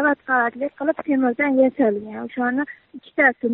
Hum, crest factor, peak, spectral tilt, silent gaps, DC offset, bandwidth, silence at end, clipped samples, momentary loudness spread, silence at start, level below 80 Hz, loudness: none; 18 dB; -2 dBFS; -4.5 dB/octave; none; under 0.1%; 4 kHz; 0 s; under 0.1%; 12 LU; 0 s; -66 dBFS; -21 LUFS